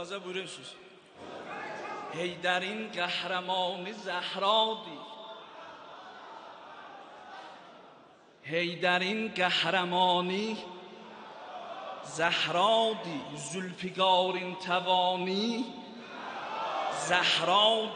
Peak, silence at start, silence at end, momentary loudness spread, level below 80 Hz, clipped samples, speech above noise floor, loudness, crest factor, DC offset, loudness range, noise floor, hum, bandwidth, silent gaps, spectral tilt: -10 dBFS; 0 s; 0 s; 22 LU; -80 dBFS; under 0.1%; 27 dB; -29 LUFS; 22 dB; under 0.1%; 7 LU; -57 dBFS; none; 10 kHz; none; -3.5 dB/octave